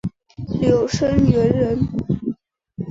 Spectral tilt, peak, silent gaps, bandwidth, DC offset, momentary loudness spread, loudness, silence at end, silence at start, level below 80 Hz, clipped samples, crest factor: -7.5 dB/octave; -2 dBFS; none; 7.8 kHz; under 0.1%; 16 LU; -19 LUFS; 0 s; 0.05 s; -36 dBFS; under 0.1%; 16 dB